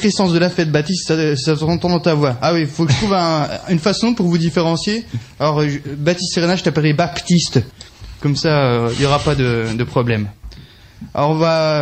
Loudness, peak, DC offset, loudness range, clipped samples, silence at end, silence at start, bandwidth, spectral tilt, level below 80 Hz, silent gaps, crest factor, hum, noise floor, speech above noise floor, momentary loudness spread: -16 LUFS; -2 dBFS; under 0.1%; 2 LU; under 0.1%; 0 s; 0 s; 8.8 kHz; -5.5 dB/octave; -42 dBFS; none; 14 dB; none; -40 dBFS; 24 dB; 5 LU